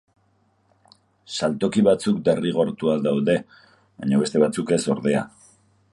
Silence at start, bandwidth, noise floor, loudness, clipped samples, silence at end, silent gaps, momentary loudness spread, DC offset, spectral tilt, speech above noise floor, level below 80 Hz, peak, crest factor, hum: 1.3 s; 11.5 kHz; -64 dBFS; -22 LUFS; under 0.1%; 0.65 s; none; 7 LU; under 0.1%; -6 dB/octave; 43 dB; -60 dBFS; -4 dBFS; 18 dB; none